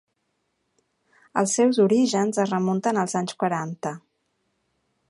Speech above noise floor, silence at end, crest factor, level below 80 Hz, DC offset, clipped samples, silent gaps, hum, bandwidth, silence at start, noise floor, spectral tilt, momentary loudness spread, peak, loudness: 52 dB; 1.1 s; 20 dB; -74 dBFS; under 0.1%; under 0.1%; none; none; 11.5 kHz; 1.35 s; -74 dBFS; -5 dB/octave; 12 LU; -6 dBFS; -23 LUFS